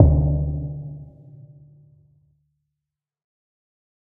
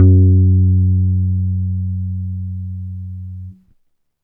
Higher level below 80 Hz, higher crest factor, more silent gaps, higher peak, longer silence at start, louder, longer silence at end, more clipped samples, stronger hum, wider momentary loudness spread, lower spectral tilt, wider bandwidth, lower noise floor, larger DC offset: first, -30 dBFS vs -36 dBFS; first, 24 dB vs 14 dB; neither; about the same, 0 dBFS vs 0 dBFS; about the same, 0 s vs 0 s; second, -23 LUFS vs -16 LUFS; first, 2.95 s vs 0.7 s; neither; neither; first, 27 LU vs 19 LU; about the same, -15.5 dB/octave vs -15 dB/octave; first, 1.2 kHz vs 0.7 kHz; first, -85 dBFS vs -61 dBFS; neither